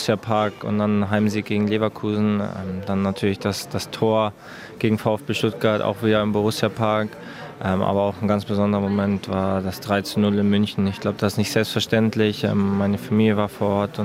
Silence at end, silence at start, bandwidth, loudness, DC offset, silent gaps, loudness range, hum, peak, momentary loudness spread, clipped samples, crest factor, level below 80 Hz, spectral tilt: 0 s; 0 s; 16 kHz; -22 LUFS; under 0.1%; none; 2 LU; none; -4 dBFS; 6 LU; under 0.1%; 18 dB; -60 dBFS; -6.5 dB/octave